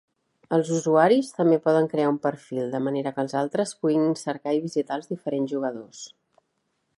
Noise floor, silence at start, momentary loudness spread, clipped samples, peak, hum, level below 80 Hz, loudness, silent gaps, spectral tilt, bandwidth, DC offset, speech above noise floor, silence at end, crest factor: -75 dBFS; 0.5 s; 11 LU; under 0.1%; -4 dBFS; none; -76 dBFS; -24 LUFS; none; -6 dB/octave; 11.5 kHz; under 0.1%; 51 dB; 0.9 s; 20 dB